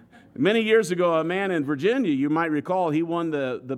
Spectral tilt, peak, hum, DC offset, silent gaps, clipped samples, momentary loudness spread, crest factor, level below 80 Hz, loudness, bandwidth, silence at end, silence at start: -6 dB/octave; -8 dBFS; none; under 0.1%; none; under 0.1%; 6 LU; 16 dB; -72 dBFS; -23 LUFS; 13.5 kHz; 0 s; 0.4 s